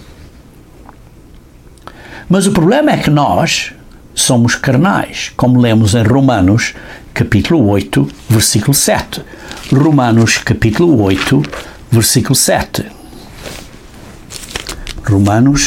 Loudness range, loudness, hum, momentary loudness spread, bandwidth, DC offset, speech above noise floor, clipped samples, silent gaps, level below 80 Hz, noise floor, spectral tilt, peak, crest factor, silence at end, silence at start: 4 LU; -11 LUFS; none; 18 LU; 17 kHz; under 0.1%; 28 dB; under 0.1%; none; -34 dBFS; -38 dBFS; -5 dB/octave; 0 dBFS; 12 dB; 0 s; 0 s